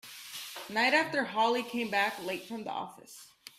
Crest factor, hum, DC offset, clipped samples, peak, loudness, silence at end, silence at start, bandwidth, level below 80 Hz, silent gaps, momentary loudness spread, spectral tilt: 22 dB; none; under 0.1%; under 0.1%; -12 dBFS; -31 LUFS; 0.1 s; 0.05 s; 16 kHz; -78 dBFS; none; 18 LU; -3 dB/octave